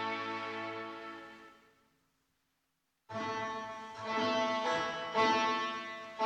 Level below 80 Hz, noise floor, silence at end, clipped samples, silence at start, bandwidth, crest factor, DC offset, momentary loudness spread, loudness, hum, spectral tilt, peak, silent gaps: -76 dBFS; -82 dBFS; 0 s; under 0.1%; 0 s; 10 kHz; 20 dB; under 0.1%; 16 LU; -35 LUFS; none; -3.5 dB/octave; -18 dBFS; none